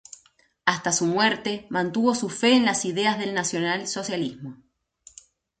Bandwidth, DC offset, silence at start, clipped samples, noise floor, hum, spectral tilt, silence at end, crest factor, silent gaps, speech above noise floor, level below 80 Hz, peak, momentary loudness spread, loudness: 9.4 kHz; under 0.1%; 0.65 s; under 0.1%; -61 dBFS; none; -3 dB/octave; 1.05 s; 22 dB; none; 37 dB; -66 dBFS; -4 dBFS; 9 LU; -24 LUFS